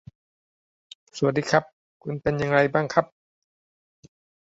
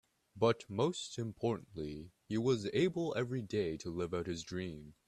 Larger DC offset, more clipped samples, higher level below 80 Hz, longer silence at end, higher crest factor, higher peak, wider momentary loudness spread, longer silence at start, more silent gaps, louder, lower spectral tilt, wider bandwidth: neither; neither; first, -58 dBFS vs -66 dBFS; first, 1.35 s vs 0.15 s; about the same, 24 dB vs 20 dB; first, -4 dBFS vs -16 dBFS; first, 18 LU vs 10 LU; first, 1.15 s vs 0.35 s; first, 1.73-2.00 s vs none; first, -24 LUFS vs -37 LUFS; about the same, -6 dB/octave vs -6 dB/octave; second, 8 kHz vs 12.5 kHz